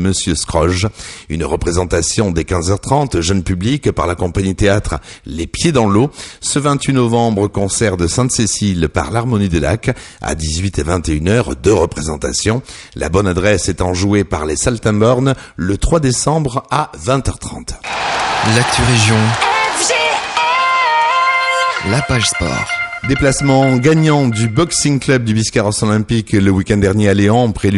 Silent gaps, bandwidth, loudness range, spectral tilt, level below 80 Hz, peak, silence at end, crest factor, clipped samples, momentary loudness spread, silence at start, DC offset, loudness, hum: none; 11.5 kHz; 3 LU; -4.5 dB/octave; -30 dBFS; 0 dBFS; 0 s; 14 dB; under 0.1%; 7 LU; 0 s; under 0.1%; -14 LUFS; none